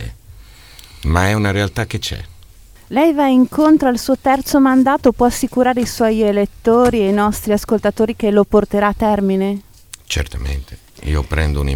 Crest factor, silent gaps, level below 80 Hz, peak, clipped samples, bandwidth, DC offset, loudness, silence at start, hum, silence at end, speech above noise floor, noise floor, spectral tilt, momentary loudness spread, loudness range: 16 dB; none; -28 dBFS; 0 dBFS; under 0.1%; 18 kHz; 0.2%; -15 LUFS; 0 s; none; 0 s; 27 dB; -42 dBFS; -6 dB/octave; 11 LU; 4 LU